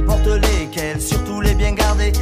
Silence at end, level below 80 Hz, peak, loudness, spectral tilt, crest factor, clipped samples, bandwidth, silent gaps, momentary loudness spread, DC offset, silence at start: 0 s; -18 dBFS; -4 dBFS; -18 LUFS; -5 dB/octave; 12 dB; under 0.1%; 15.5 kHz; none; 5 LU; under 0.1%; 0 s